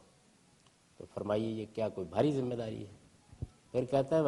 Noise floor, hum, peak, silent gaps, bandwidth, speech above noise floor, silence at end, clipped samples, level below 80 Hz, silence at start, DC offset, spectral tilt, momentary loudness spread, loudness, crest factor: -66 dBFS; none; -16 dBFS; none; 11.5 kHz; 33 dB; 0 s; under 0.1%; -64 dBFS; 1 s; under 0.1%; -7.5 dB/octave; 17 LU; -35 LUFS; 20 dB